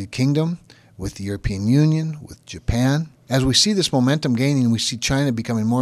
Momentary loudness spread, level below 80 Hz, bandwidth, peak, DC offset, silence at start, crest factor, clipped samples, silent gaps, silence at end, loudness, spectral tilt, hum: 14 LU; -38 dBFS; 14.5 kHz; -2 dBFS; under 0.1%; 0 s; 18 dB; under 0.1%; none; 0 s; -20 LUFS; -5 dB/octave; none